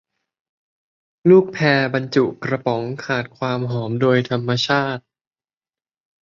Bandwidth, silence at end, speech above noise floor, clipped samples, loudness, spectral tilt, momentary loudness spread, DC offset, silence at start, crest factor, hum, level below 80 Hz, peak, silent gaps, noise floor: 7.4 kHz; 1.25 s; over 72 dB; under 0.1%; -19 LUFS; -6.5 dB/octave; 10 LU; under 0.1%; 1.25 s; 18 dB; none; -60 dBFS; -2 dBFS; none; under -90 dBFS